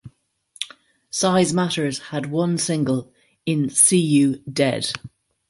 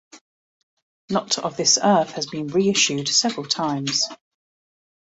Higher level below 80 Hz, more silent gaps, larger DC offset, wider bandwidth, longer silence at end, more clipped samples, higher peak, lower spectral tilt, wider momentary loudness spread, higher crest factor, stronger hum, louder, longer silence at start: about the same, -60 dBFS vs -64 dBFS; second, none vs 0.21-1.08 s; neither; first, 12 kHz vs 8 kHz; second, 0.45 s vs 0.9 s; neither; about the same, -2 dBFS vs -4 dBFS; first, -4 dB/octave vs -2.5 dB/octave; first, 17 LU vs 9 LU; about the same, 20 dB vs 20 dB; neither; about the same, -20 LUFS vs -20 LUFS; about the same, 0.05 s vs 0.15 s